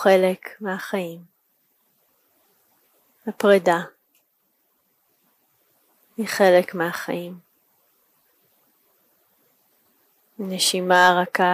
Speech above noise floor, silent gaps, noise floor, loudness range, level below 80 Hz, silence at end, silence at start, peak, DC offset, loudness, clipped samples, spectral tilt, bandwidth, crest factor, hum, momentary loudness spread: 48 dB; none; -68 dBFS; 10 LU; -78 dBFS; 0 s; 0 s; -4 dBFS; under 0.1%; -20 LUFS; under 0.1%; -4 dB/octave; 15.5 kHz; 20 dB; none; 19 LU